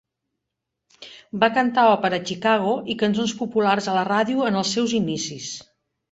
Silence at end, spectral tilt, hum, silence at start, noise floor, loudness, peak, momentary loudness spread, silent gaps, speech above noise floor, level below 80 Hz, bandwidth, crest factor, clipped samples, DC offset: 0.5 s; -4.5 dB/octave; none; 1 s; -82 dBFS; -21 LUFS; -2 dBFS; 15 LU; none; 61 dB; -62 dBFS; 8.2 kHz; 20 dB; under 0.1%; under 0.1%